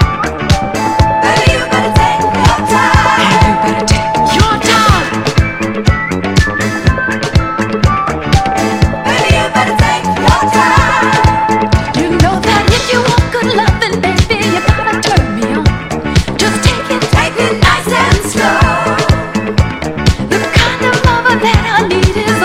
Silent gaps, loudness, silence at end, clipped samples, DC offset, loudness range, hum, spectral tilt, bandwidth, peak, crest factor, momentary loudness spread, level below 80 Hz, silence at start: none; -11 LUFS; 0 s; 0.5%; under 0.1%; 2 LU; none; -5 dB/octave; 16 kHz; 0 dBFS; 10 dB; 5 LU; -20 dBFS; 0 s